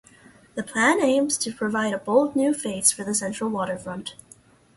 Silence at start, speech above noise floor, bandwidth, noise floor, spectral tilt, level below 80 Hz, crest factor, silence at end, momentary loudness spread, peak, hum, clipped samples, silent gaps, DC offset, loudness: 0.55 s; 30 dB; 12 kHz; -53 dBFS; -3 dB/octave; -62 dBFS; 22 dB; 0.65 s; 14 LU; -4 dBFS; none; under 0.1%; none; under 0.1%; -23 LUFS